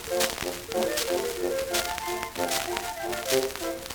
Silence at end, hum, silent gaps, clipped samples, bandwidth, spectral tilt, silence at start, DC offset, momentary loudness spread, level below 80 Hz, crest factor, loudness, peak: 0 s; none; none; under 0.1%; over 20 kHz; -2 dB/octave; 0 s; under 0.1%; 5 LU; -52 dBFS; 22 dB; -28 LUFS; -6 dBFS